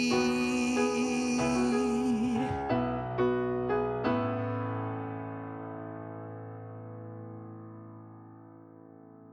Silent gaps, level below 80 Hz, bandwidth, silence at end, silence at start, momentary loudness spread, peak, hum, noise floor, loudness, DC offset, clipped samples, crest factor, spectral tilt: none; -56 dBFS; 12 kHz; 0 s; 0 s; 19 LU; -14 dBFS; none; -52 dBFS; -31 LUFS; under 0.1%; under 0.1%; 18 dB; -5.5 dB/octave